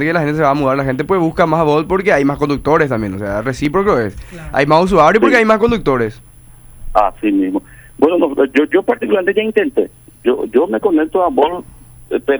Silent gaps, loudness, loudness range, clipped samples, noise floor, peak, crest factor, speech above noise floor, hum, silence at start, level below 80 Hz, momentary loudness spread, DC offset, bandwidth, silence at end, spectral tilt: none; -14 LUFS; 3 LU; under 0.1%; -39 dBFS; 0 dBFS; 14 dB; 25 dB; none; 0 s; -36 dBFS; 9 LU; under 0.1%; over 20 kHz; 0 s; -7 dB/octave